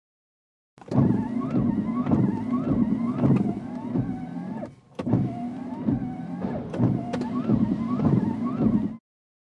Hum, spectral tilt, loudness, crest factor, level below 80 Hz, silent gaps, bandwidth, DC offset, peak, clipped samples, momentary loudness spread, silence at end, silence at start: none; -10 dB/octave; -26 LUFS; 18 dB; -50 dBFS; none; 7.4 kHz; under 0.1%; -8 dBFS; under 0.1%; 10 LU; 0.55 s; 0.85 s